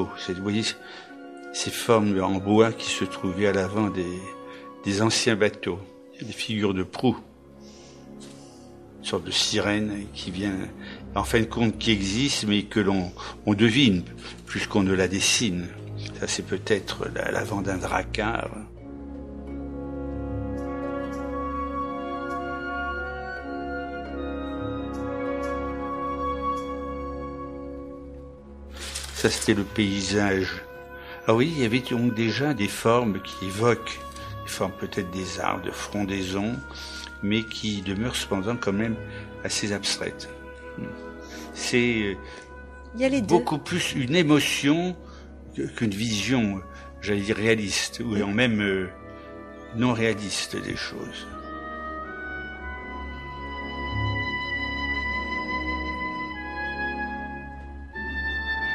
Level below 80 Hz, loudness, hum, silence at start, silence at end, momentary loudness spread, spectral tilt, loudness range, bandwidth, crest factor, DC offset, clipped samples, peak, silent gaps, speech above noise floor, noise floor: -44 dBFS; -26 LUFS; none; 0 s; 0 s; 17 LU; -4.5 dB/octave; 8 LU; 15 kHz; 24 dB; under 0.1%; under 0.1%; -4 dBFS; none; 22 dB; -47 dBFS